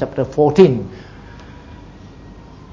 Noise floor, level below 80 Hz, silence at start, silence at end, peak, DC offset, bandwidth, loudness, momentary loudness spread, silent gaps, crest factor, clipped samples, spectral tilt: -38 dBFS; -42 dBFS; 0 s; 0.4 s; 0 dBFS; under 0.1%; 7.6 kHz; -14 LUFS; 27 LU; none; 18 dB; under 0.1%; -8 dB/octave